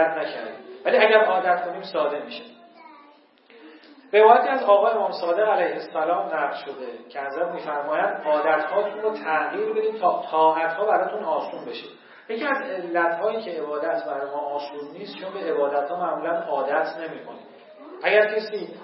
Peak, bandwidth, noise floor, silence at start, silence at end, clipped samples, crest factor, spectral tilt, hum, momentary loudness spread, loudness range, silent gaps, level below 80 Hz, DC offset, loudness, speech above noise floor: -2 dBFS; 5.8 kHz; -54 dBFS; 0 s; 0 s; under 0.1%; 22 dB; -8 dB/octave; none; 17 LU; 6 LU; none; under -90 dBFS; under 0.1%; -23 LUFS; 31 dB